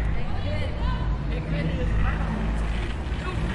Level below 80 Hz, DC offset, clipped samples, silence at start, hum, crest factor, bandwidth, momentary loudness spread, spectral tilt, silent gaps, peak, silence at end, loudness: -28 dBFS; under 0.1%; under 0.1%; 0 s; none; 12 dB; 10.5 kHz; 4 LU; -7 dB/octave; none; -12 dBFS; 0 s; -28 LUFS